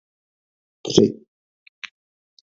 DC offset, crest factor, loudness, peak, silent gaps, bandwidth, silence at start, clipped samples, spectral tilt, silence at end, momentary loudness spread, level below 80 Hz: under 0.1%; 26 dB; -19 LUFS; 0 dBFS; none; 7.6 kHz; 0.85 s; under 0.1%; -5 dB/octave; 1.3 s; 21 LU; -56 dBFS